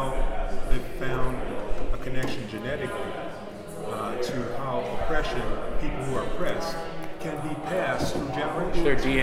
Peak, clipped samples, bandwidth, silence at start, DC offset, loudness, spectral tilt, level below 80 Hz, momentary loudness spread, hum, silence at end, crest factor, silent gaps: -6 dBFS; under 0.1%; 13.5 kHz; 0 s; under 0.1%; -30 LUFS; -5.5 dB/octave; -32 dBFS; 8 LU; none; 0 s; 18 dB; none